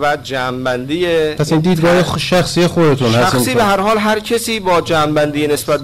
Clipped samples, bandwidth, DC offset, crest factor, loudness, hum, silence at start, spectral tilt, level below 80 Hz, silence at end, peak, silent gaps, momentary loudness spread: under 0.1%; 16 kHz; 1%; 8 dB; -14 LUFS; none; 0 s; -5 dB/octave; -40 dBFS; 0 s; -6 dBFS; none; 5 LU